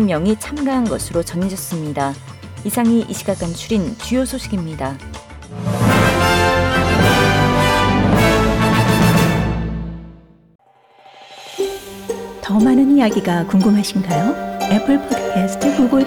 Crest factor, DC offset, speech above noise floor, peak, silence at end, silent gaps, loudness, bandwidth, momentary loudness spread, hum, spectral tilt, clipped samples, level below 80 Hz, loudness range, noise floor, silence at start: 14 dB; under 0.1%; 31 dB; -4 dBFS; 0 s; 10.55-10.59 s; -16 LUFS; 18.5 kHz; 14 LU; none; -5.5 dB/octave; under 0.1%; -34 dBFS; 7 LU; -48 dBFS; 0 s